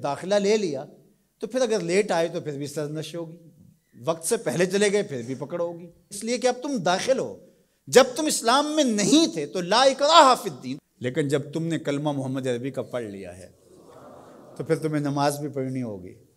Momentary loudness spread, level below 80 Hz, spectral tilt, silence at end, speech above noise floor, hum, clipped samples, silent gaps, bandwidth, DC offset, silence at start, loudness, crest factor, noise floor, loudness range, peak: 16 LU; -70 dBFS; -4 dB/octave; 0.2 s; 30 dB; none; under 0.1%; none; 16 kHz; under 0.1%; 0 s; -23 LUFS; 24 dB; -54 dBFS; 10 LU; -2 dBFS